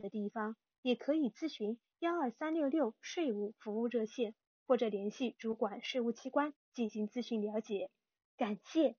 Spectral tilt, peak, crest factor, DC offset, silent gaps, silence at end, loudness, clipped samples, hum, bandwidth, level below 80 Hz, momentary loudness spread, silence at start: -4 dB/octave; -18 dBFS; 18 dB; under 0.1%; 0.78-0.83 s, 4.47-4.66 s, 6.56-6.72 s, 8.25-8.38 s; 0.05 s; -38 LUFS; under 0.1%; none; 6.6 kHz; -88 dBFS; 7 LU; 0 s